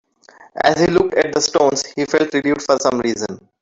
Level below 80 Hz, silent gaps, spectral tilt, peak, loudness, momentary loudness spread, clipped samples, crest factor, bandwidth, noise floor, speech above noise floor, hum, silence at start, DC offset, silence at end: -50 dBFS; none; -3.5 dB/octave; 0 dBFS; -17 LUFS; 7 LU; under 0.1%; 18 dB; 8 kHz; -47 dBFS; 30 dB; none; 0.55 s; under 0.1%; 0.25 s